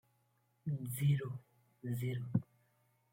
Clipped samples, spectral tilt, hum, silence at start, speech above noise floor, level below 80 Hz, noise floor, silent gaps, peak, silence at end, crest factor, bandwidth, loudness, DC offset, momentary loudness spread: under 0.1%; -7 dB/octave; none; 0.65 s; 40 dB; -74 dBFS; -77 dBFS; none; -18 dBFS; 0.7 s; 22 dB; 16.5 kHz; -39 LUFS; under 0.1%; 13 LU